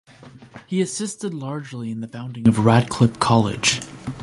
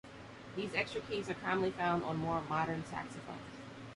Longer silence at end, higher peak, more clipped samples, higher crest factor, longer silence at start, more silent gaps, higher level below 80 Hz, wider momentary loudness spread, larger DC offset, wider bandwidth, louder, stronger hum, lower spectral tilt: about the same, 0 s vs 0 s; first, 0 dBFS vs -18 dBFS; neither; about the same, 20 dB vs 20 dB; first, 0.2 s vs 0.05 s; neither; first, -50 dBFS vs -64 dBFS; about the same, 13 LU vs 14 LU; neither; about the same, 11.5 kHz vs 11.5 kHz; first, -21 LUFS vs -37 LUFS; neither; about the same, -5 dB/octave vs -6 dB/octave